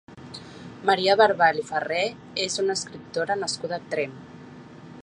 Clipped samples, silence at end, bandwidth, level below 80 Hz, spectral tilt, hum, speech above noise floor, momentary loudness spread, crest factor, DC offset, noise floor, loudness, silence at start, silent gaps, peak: under 0.1%; 0.05 s; 11.5 kHz; -64 dBFS; -3 dB/octave; none; 20 dB; 25 LU; 22 dB; under 0.1%; -44 dBFS; -24 LUFS; 0.1 s; none; -4 dBFS